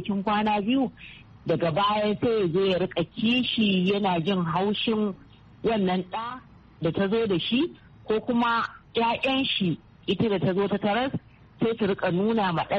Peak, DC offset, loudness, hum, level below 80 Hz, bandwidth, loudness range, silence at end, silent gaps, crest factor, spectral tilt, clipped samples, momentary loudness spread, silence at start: -12 dBFS; under 0.1%; -25 LUFS; none; -56 dBFS; 6.4 kHz; 3 LU; 0 s; none; 14 dB; -4 dB/octave; under 0.1%; 8 LU; 0 s